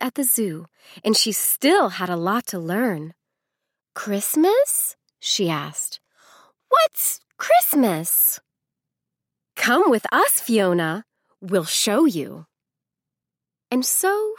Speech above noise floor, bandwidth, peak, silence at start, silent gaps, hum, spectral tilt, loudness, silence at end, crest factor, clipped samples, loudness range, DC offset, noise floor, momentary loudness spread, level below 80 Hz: 67 dB; 17.5 kHz; -4 dBFS; 0 s; none; none; -3 dB/octave; -20 LUFS; 0.05 s; 18 dB; under 0.1%; 3 LU; under 0.1%; -87 dBFS; 13 LU; -78 dBFS